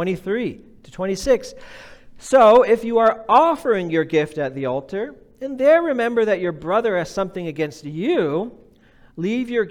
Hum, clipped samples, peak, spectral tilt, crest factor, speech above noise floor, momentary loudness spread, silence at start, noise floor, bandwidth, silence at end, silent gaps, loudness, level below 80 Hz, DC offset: none; under 0.1%; -4 dBFS; -6 dB/octave; 16 dB; 32 dB; 14 LU; 0 s; -51 dBFS; 14 kHz; 0 s; none; -19 LUFS; -50 dBFS; under 0.1%